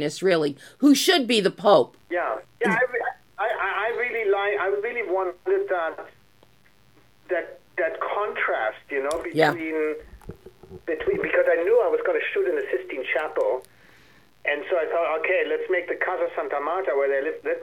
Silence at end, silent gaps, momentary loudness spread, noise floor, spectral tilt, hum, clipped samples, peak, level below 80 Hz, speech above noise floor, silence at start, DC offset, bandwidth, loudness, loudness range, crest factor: 0 s; none; 10 LU; -59 dBFS; -4 dB/octave; 60 Hz at -65 dBFS; under 0.1%; -4 dBFS; -60 dBFS; 36 dB; 0 s; 0.1%; 17 kHz; -24 LUFS; 7 LU; 22 dB